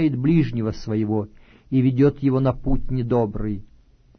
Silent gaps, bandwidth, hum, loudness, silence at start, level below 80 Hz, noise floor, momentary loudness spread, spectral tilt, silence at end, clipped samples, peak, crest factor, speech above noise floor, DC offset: none; 6.4 kHz; none; -22 LUFS; 0 s; -34 dBFS; -53 dBFS; 10 LU; -10 dB/octave; 0.55 s; under 0.1%; -6 dBFS; 14 dB; 32 dB; under 0.1%